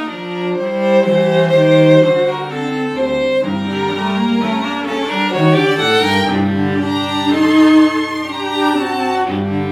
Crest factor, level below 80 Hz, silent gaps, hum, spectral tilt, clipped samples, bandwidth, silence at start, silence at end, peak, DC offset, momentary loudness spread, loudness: 14 dB; -56 dBFS; none; none; -6.5 dB/octave; under 0.1%; 13.5 kHz; 0 s; 0 s; 0 dBFS; under 0.1%; 9 LU; -15 LUFS